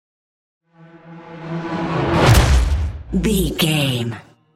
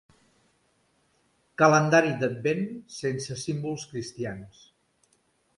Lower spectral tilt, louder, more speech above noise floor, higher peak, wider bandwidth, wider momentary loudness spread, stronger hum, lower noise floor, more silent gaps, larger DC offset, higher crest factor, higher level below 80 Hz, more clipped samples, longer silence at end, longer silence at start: about the same, -5 dB/octave vs -5.5 dB/octave; first, -18 LUFS vs -26 LUFS; second, 26 dB vs 43 dB; first, -2 dBFS vs -6 dBFS; first, 16 kHz vs 11.5 kHz; about the same, 16 LU vs 16 LU; neither; second, -44 dBFS vs -69 dBFS; neither; neither; second, 18 dB vs 24 dB; first, -24 dBFS vs -66 dBFS; neither; second, 0.35 s vs 1.1 s; second, 0.95 s vs 1.6 s